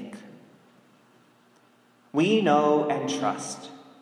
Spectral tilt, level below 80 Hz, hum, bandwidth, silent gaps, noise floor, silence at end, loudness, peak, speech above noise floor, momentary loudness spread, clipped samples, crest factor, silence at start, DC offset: -5 dB/octave; -80 dBFS; none; 12 kHz; none; -60 dBFS; 0.2 s; -24 LUFS; -8 dBFS; 37 dB; 22 LU; under 0.1%; 20 dB; 0 s; under 0.1%